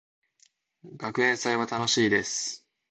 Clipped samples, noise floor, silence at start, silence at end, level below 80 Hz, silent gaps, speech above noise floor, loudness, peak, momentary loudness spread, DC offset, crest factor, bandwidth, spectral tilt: under 0.1%; -66 dBFS; 0.85 s; 0.35 s; -68 dBFS; none; 39 dB; -26 LUFS; -10 dBFS; 12 LU; under 0.1%; 20 dB; 9 kHz; -2.5 dB/octave